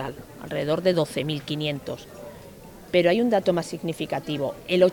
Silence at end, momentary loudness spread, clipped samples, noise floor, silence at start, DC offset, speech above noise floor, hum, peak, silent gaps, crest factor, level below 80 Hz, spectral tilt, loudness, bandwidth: 0 s; 21 LU; under 0.1%; -44 dBFS; 0 s; under 0.1%; 20 dB; none; -6 dBFS; none; 18 dB; -56 dBFS; -6 dB/octave; -25 LUFS; 19.5 kHz